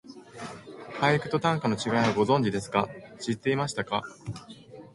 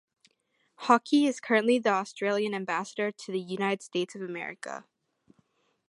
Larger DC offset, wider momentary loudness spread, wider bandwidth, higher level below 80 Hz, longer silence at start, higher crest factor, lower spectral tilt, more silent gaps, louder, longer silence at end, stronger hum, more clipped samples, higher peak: neither; first, 18 LU vs 13 LU; about the same, 11.5 kHz vs 11.5 kHz; first, -60 dBFS vs -84 dBFS; second, 0.05 s vs 0.8 s; about the same, 20 dB vs 22 dB; about the same, -5.5 dB/octave vs -4.5 dB/octave; neither; about the same, -27 LUFS vs -28 LUFS; second, 0.1 s vs 1.05 s; neither; neither; about the same, -8 dBFS vs -8 dBFS